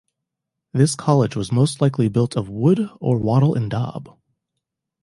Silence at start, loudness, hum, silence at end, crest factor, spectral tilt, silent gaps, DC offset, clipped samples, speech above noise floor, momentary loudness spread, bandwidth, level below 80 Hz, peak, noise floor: 0.75 s; -20 LUFS; none; 0.95 s; 18 dB; -7 dB/octave; none; under 0.1%; under 0.1%; 63 dB; 8 LU; 11.5 kHz; -52 dBFS; -2 dBFS; -82 dBFS